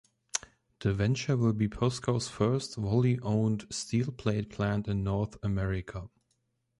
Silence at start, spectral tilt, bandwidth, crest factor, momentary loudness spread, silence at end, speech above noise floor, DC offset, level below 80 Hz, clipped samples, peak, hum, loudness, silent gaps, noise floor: 0.35 s; -6 dB/octave; 11.5 kHz; 22 dB; 8 LU; 0.75 s; 47 dB; under 0.1%; -50 dBFS; under 0.1%; -8 dBFS; none; -31 LUFS; none; -77 dBFS